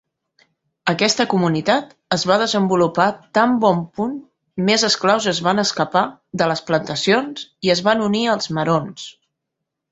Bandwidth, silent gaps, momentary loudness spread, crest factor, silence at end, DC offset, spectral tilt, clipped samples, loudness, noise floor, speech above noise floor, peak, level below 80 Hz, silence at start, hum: 8.2 kHz; none; 9 LU; 18 dB; 0.8 s; under 0.1%; -4.5 dB/octave; under 0.1%; -18 LUFS; -80 dBFS; 62 dB; 0 dBFS; -60 dBFS; 0.85 s; none